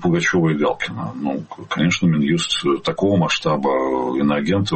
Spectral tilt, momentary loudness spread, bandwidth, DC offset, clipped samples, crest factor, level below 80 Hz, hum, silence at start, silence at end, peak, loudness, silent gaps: -5.5 dB/octave; 8 LU; 8.8 kHz; under 0.1%; under 0.1%; 12 dB; -50 dBFS; none; 0 s; 0 s; -6 dBFS; -19 LUFS; none